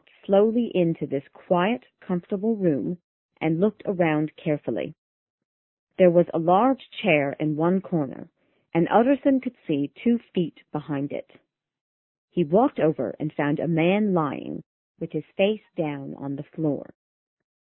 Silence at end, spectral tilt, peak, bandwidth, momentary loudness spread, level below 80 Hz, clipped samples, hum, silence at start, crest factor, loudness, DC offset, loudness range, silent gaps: 0.8 s; -11.5 dB/octave; -4 dBFS; 4.1 kHz; 13 LU; -66 dBFS; under 0.1%; none; 0.3 s; 20 dB; -24 LUFS; under 0.1%; 5 LU; 3.04-3.29 s, 4.98-5.38 s, 5.45-5.87 s, 11.81-12.28 s, 14.66-14.95 s